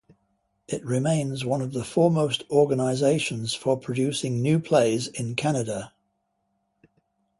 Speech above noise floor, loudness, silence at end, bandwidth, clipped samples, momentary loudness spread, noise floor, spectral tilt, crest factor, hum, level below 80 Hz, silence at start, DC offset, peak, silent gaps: 50 dB; -25 LUFS; 1.5 s; 11.5 kHz; under 0.1%; 7 LU; -74 dBFS; -5.5 dB/octave; 18 dB; none; -62 dBFS; 0.7 s; under 0.1%; -6 dBFS; none